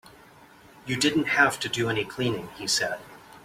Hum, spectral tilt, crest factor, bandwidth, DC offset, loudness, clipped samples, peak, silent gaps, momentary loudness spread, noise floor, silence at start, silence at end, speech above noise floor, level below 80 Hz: none; -3 dB/octave; 22 dB; 16.5 kHz; under 0.1%; -25 LUFS; under 0.1%; -6 dBFS; none; 11 LU; -52 dBFS; 0.05 s; 0.05 s; 26 dB; -62 dBFS